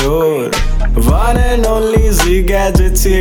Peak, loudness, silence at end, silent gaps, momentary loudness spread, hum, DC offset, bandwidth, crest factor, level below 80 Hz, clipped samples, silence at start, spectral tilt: 0 dBFS; -13 LUFS; 0 s; none; 4 LU; none; under 0.1%; 19 kHz; 10 dB; -12 dBFS; under 0.1%; 0 s; -5 dB/octave